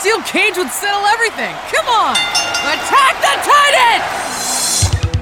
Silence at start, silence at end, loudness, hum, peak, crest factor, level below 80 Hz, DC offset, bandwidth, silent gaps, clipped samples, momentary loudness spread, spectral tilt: 0 s; 0 s; -13 LUFS; none; -2 dBFS; 12 dB; -34 dBFS; under 0.1%; 19 kHz; none; under 0.1%; 7 LU; -2 dB/octave